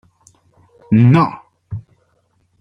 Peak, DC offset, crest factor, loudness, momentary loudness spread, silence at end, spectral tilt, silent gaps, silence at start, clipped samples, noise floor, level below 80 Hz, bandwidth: -2 dBFS; under 0.1%; 16 dB; -13 LUFS; 21 LU; 0.8 s; -9.5 dB/octave; none; 0.9 s; under 0.1%; -61 dBFS; -52 dBFS; 6.2 kHz